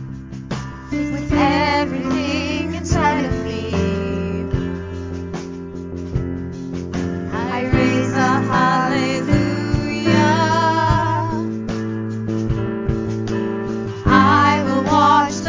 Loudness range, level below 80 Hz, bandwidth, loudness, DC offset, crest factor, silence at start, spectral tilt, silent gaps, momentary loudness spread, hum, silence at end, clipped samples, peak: 7 LU; -32 dBFS; 7.6 kHz; -19 LUFS; under 0.1%; 18 dB; 0 s; -6 dB/octave; none; 13 LU; none; 0 s; under 0.1%; 0 dBFS